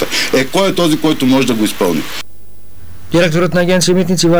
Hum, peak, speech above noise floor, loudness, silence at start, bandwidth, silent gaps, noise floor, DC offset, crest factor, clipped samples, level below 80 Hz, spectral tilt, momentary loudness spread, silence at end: none; -4 dBFS; 26 dB; -13 LUFS; 0 s; over 20 kHz; none; -38 dBFS; 7%; 10 dB; under 0.1%; -42 dBFS; -4.5 dB/octave; 7 LU; 0 s